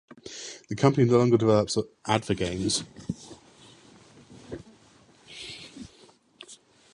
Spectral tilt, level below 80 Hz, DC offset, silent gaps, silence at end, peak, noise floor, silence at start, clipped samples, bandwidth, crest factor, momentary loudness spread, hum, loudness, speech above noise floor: -5.5 dB/octave; -56 dBFS; under 0.1%; none; 0.4 s; -4 dBFS; -57 dBFS; 0.25 s; under 0.1%; 11.5 kHz; 24 dB; 25 LU; none; -25 LUFS; 33 dB